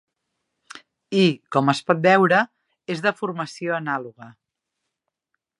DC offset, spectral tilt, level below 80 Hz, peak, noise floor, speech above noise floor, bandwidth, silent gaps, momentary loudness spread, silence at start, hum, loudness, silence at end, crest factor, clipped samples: under 0.1%; -6 dB/octave; -74 dBFS; -2 dBFS; -81 dBFS; 60 dB; 11.5 kHz; none; 14 LU; 0.75 s; none; -21 LUFS; 1.3 s; 22 dB; under 0.1%